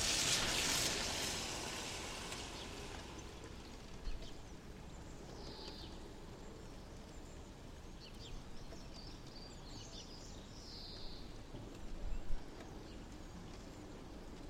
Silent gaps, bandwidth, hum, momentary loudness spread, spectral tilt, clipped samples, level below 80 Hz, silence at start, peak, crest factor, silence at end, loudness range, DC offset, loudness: none; 16 kHz; none; 19 LU; -2 dB/octave; under 0.1%; -52 dBFS; 0 s; -22 dBFS; 22 dB; 0 s; 13 LU; under 0.1%; -44 LUFS